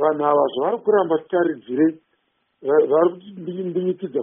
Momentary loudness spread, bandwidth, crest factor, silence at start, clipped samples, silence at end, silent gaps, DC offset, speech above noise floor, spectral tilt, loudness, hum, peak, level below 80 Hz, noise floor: 10 LU; 3.7 kHz; 16 dB; 0 s; under 0.1%; 0 s; none; under 0.1%; 49 dB; -3.5 dB/octave; -20 LUFS; none; -6 dBFS; -70 dBFS; -69 dBFS